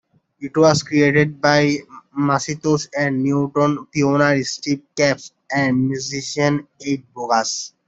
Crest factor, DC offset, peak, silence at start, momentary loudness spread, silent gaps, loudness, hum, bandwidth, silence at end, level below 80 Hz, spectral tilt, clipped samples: 16 dB; under 0.1%; -2 dBFS; 0.4 s; 10 LU; none; -19 LUFS; none; 8 kHz; 0.2 s; -58 dBFS; -5 dB/octave; under 0.1%